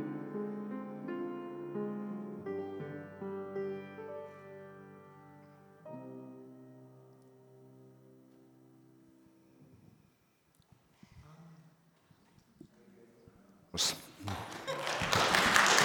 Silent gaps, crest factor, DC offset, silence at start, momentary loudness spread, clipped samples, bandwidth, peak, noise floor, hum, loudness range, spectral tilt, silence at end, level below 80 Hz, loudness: none; 34 dB; under 0.1%; 0 s; 28 LU; under 0.1%; 19 kHz; -4 dBFS; -71 dBFS; none; 24 LU; -2.5 dB/octave; 0 s; -66 dBFS; -35 LUFS